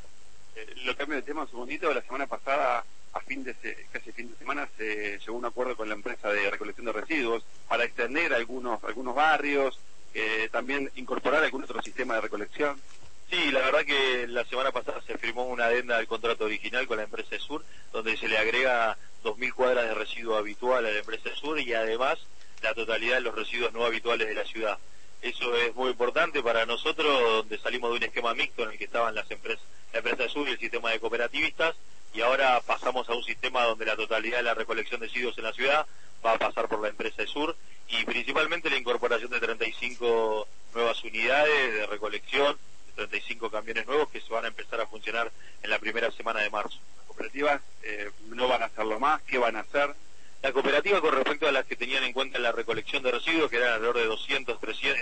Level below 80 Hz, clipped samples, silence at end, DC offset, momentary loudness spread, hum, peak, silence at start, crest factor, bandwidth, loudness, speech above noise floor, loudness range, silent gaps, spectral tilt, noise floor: -60 dBFS; under 0.1%; 0 s; 2%; 11 LU; none; -12 dBFS; 0.55 s; 18 dB; 8.8 kHz; -28 LUFS; 29 dB; 4 LU; none; -3 dB/octave; -58 dBFS